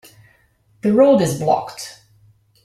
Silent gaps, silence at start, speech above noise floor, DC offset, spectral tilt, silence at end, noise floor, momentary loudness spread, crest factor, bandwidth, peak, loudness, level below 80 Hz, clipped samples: none; 0.85 s; 42 dB; under 0.1%; -6 dB/octave; 0.7 s; -57 dBFS; 20 LU; 18 dB; 15.5 kHz; -2 dBFS; -16 LUFS; -58 dBFS; under 0.1%